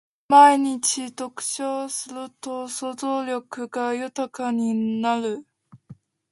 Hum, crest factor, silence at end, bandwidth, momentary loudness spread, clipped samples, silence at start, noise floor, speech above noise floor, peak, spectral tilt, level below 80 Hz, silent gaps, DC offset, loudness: none; 22 dB; 0.4 s; 11.5 kHz; 17 LU; under 0.1%; 0.3 s; -49 dBFS; 26 dB; -2 dBFS; -3 dB/octave; -74 dBFS; none; under 0.1%; -23 LUFS